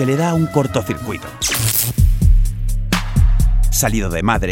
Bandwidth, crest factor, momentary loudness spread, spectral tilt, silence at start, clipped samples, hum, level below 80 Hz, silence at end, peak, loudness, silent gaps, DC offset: 17 kHz; 14 dB; 7 LU; -4.5 dB/octave; 0 s; under 0.1%; none; -18 dBFS; 0 s; 0 dBFS; -17 LUFS; none; under 0.1%